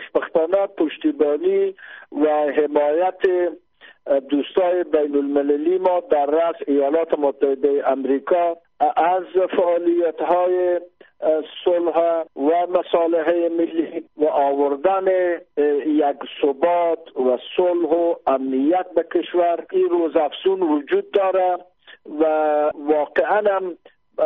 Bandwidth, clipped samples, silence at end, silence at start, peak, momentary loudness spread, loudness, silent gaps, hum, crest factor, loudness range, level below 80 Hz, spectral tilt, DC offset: 3.9 kHz; under 0.1%; 0 s; 0 s; -4 dBFS; 4 LU; -20 LUFS; none; none; 14 dB; 1 LU; -66 dBFS; -3 dB/octave; under 0.1%